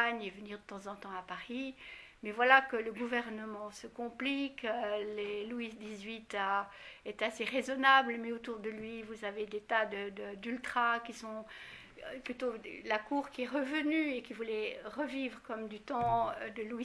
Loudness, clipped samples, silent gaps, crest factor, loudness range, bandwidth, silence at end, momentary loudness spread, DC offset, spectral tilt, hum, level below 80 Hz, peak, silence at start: -35 LUFS; under 0.1%; none; 26 dB; 5 LU; 11 kHz; 0 s; 15 LU; under 0.1%; -4 dB/octave; none; -68 dBFS; -10 dBFS; 0 s